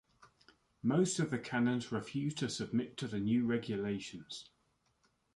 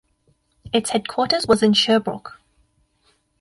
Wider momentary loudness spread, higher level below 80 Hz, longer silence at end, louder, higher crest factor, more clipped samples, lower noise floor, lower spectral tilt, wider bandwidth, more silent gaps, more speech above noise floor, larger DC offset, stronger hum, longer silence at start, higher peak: second, 10 LU vs 16 LU; second, -70 dBFS vs -54 dBFS; second, 0.9 s vs 1.1 s; second, -36 LUFS vs -19 LUFS; about the same, 16 dB vs 18 dB; neither; first, -77 dBFS vs -64 dBFS; first, -5.5 dB/octave vs -4 dB/octave; about the same, 11.5 kHz vs 11.5 kHz; neither; about the same, 42 dB vs 45 dB; neither; neither; second, 0.2 s vs 0.65 s; second, -20 dBFS vs -4 dBFS